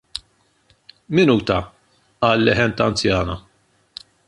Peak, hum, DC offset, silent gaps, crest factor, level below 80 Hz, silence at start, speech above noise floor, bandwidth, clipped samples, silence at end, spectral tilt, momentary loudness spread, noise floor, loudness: -2 dBFS; none; under 0.1%; none; 18 dB; -42 dBFS; 0.15 s; 43 dB; 11.5 kHz; under 0.1%; 0.9 s; -5.5 dB/octave; 23 LU; -61 dBFS; -18 LUFS